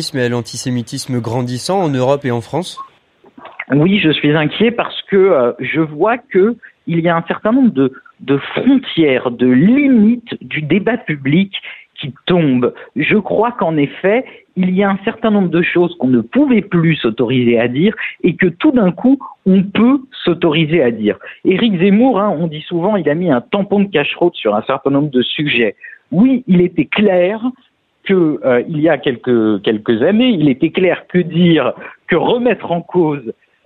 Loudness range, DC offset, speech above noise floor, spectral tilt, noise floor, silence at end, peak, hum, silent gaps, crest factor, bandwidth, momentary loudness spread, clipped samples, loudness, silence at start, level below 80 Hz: 2 LU; under 0.1%; 35 dB; -7 dB/octave; -49 dBFS; 0.35 s; 0 dBFS; none; none; 14 dB; 11.5 kHz; 8 LU; under 0.1%; -14 LUFS; 0 s; -52 dBFS